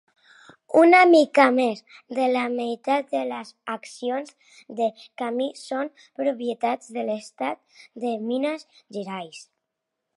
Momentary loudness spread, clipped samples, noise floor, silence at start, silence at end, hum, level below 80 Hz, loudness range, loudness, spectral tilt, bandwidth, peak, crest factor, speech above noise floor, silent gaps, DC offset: 19 LU; under 0.1%; -82 dBFS; 0.7 s; 0.75 s; none; -84 dBFS; 10 LU; -23 LUFS; -4.5 dB/octave; 11.5 kHz; -2 dBFS; 22 dB; 59 dB; none; under 0.1%